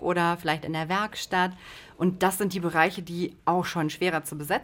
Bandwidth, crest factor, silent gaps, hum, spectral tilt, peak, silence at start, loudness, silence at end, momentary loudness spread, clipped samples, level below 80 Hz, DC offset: 17 kHz; 22 dB; none; none; -5 dB/octave; -6 dBFS; 0 s; -27 LUFS; 0 s; 7 LU; under 0.1%; -60 dBFS; under 0.1%